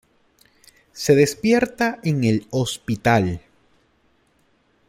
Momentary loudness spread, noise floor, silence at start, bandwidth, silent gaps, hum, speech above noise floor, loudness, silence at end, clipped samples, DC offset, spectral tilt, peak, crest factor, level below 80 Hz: 9 LU; -62 dBFS; 0.95 s; 16.5 kHz; none; none; 43 dB; -20 LUFS; 1.5 s; under 0.1%; under 0.1%; -5.5 dB/octave; -2 dBFS; 20 dB; -54 dBFS